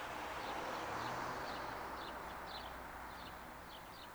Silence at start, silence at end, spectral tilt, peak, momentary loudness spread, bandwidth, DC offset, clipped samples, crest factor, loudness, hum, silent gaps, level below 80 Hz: 0 s; 0 s; -3.5 dB/octave; -30 dBFS; 9 LU; over 20 kHz; under 0.1%; under 0.1%; 16 dB; -46 LUFS; none; none; -62 dBFS